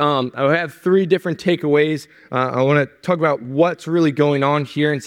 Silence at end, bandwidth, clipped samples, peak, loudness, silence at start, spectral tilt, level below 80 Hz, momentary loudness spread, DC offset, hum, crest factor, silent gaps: 0 s; 15 kHz; under 0.1%; -2 dBFS; -18 LUFS; 0 s; -7 dB/octave; -64 dBFS; 5 LU; under 0.1%; none; 16 dB; none